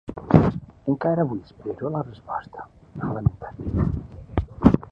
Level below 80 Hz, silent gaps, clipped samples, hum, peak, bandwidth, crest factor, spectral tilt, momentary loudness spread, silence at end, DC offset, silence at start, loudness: -36 dBFS; none; under 0.1%; none; 0 dBFS; 6 kHz; 24 dB; -10.5 dB/octave; 15 LU; 0.05 s; under 0.1%; 0.1 s; -25 LUFS